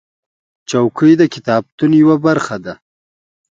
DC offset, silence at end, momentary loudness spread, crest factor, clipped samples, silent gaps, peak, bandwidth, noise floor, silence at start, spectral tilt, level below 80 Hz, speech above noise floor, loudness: under 0.1%; 0.8 s; 12 LU; 14 dB; under 0.1%; 1.72-1.78 s; 0 dBFS; 7.8 kHz; under -90 dBFS; 0.7 s; -6.5 dB/octave; -58 dBFS; over 78 dB; -13 LUFS